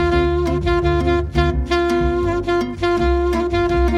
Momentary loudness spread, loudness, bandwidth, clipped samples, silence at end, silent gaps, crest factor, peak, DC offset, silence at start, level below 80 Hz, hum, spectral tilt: 2 LU; -18 LUFS; 11.5 kHz; under 0.1%; 0 s; none; 14 dB; -4 dBFS; under 0.1%; 0 s; -24 dBFS; none; -7 dB/octave